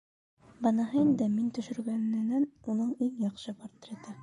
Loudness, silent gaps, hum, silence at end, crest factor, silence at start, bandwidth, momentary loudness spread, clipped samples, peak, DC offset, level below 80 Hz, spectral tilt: -30 LUFS; none; none; 0 s; 16 dB; 0.6 s; 10.5 kHz; 17 LU; under 0.1%; -16 dBFS; under 0.1%; -72 dBFS; -7.5 dB/octave